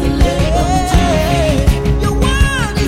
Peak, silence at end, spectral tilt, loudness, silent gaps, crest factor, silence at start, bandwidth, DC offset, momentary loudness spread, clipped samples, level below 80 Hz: -2 dBFS; 0 s; -5.5 dB/octave; -14 LUFS; none; 10 dB; 0 s; 16 kHz; under 0.1%; 2 LU; under 0.1%; -16 dBFS